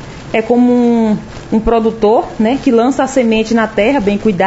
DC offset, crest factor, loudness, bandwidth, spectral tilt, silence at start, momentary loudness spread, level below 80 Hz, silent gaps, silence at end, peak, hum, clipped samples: under 0.1%; 12 dB; -12 LUFS; 8 kHz; -6 dB/octave; 0 s; 5 LU; -34 dBFS; none; 0 s; 0 dBFS; none; under 0.1%